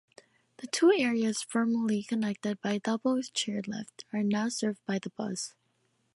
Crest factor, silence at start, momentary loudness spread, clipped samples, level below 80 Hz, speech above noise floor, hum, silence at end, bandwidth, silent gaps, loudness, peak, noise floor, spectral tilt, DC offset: 18 dB; 0.6 s; 12 LU; under 0.1%; -76 dBFS; 44 dB; none; 0.65 s; 11.5 kHz; none; -30 LUFS; -14 dBFS; -74 dBFS; -4.5 dB/octave; under 0.1%